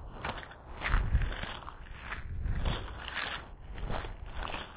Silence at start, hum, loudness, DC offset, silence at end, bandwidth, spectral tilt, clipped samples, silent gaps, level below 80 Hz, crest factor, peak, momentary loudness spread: 0 s; none; -38 LUFS; under 0.1%; 0 s; 4 kHz; -3.5 dB/octave; under 0.1%; none; -38 dBFS; 18 dB; -16 dBFS; 11 LU